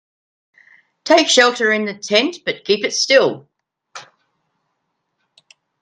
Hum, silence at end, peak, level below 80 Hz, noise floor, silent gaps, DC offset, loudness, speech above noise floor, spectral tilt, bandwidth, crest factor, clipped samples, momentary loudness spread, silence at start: none; 1.8 s; 0 dBFS; -68 dBFS; -73 dBFS; none; under 0.1%; -15 LUFS; 57 dB; -2 dB/octave; 10.5 kHz; 20 dB; under 0.1%; 11 LU; 1.05 s